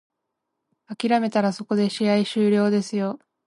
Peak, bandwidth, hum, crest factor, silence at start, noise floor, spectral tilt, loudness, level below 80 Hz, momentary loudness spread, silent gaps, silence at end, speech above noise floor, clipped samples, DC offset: -8 dBFS; 11.5 kHz; none; 16 dB; 0.9 s; -80 dBFS; -6 dB/octave; -22 LUFS; -72 dBFS; 8 LU; none; 0.3 s; 59 dB; under 0.1%; under 0.1%